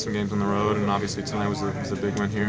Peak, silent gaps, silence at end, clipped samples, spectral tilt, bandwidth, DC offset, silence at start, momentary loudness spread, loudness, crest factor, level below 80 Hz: -10 dBFS; none; 0 s; under 0.1%; -6 dB/octave; 8 kHz; under 0.1%; 0 s; 5 LU; -26 LUFS; 16 dB; -46 dBFS